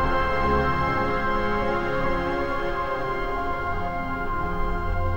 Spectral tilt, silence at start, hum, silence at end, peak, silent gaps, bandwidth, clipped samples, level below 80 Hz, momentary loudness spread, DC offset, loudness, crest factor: -7 dB/octave; 0 s; none; 0 s; -12 dBFS; none; 16.5 kHz; under 0.1%; -32 dBFS; 6 LU; 0.8%; -26 LUFS; 14 dB